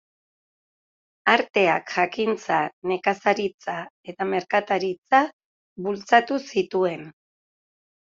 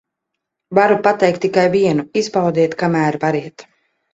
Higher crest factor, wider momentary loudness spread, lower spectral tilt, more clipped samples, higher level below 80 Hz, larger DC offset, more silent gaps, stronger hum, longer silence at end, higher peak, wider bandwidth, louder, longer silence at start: first, 22 dB vs 16 dB; first, 11 LU vs 6 LU; about the same, -5 dB/octave vs -6 dB/octave; neither; second, -70 dBFS vs -58 dBFS; neither; first, 1.50-1.54 s, 2.73-2.82 s, 3.54-3.59 s, 3.90-4.03 s, 4.98-5.02 s, 5.33-5.76 s vs none; neither; first, 0.9 s vs 0.5 s; about the same, -2 dBFS vs 0 dBFS; about the same, 7.6 kHz vs 8 kHz; second, -23 LUFS vs -16 LUFS; first, 1.25 s vs 0.7 s